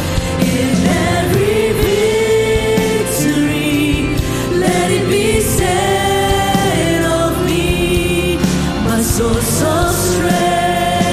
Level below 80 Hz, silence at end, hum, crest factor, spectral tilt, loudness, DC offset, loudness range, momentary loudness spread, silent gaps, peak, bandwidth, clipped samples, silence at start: -28 dBFS; 0 s; none; 12 dB; -4.5 dB/octave; -14 LUFS; under 0.1%; 1 LU; 2 LU; none; 0 dBFS; 15.5 kHz; under 0.1%; 0 s